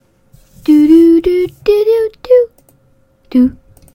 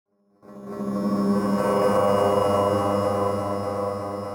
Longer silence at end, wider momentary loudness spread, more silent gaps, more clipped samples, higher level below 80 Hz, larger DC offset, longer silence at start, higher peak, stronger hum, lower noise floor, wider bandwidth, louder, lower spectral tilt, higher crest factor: first, 0.45 s vs 0 s; about the same, 9 LU vs 10 LU; neither; neither; first, -40 dBFS vs -56 dBFS; neither; first, 0.7 s vs 0.5 s; first, 0 dBFS vs -10 dBFS; neither; about the same, -52 dBFS vs -49 dBFS; second, 16 kHz vs 18 kHz; first, -11 LUFS vs -23 LUFS; about the same, -7 dB/octave vs -7 dB/octave; about the same, 12 dB vs 12 dB